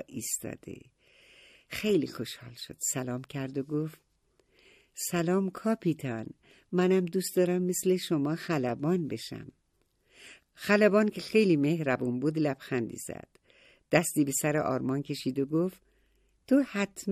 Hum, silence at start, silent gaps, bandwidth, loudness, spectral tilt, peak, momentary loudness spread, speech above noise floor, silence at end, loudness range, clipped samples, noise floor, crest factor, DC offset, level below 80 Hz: none; 0 s; none; 15.5 kHz; -29 LUFS; -5 dB/octave; -8 dBFS; 14 LU; 43 dB; 0 s; 6 LU; under 0.1%; -72 dBFS; 22 dB; under 0.1%; -68 dBFS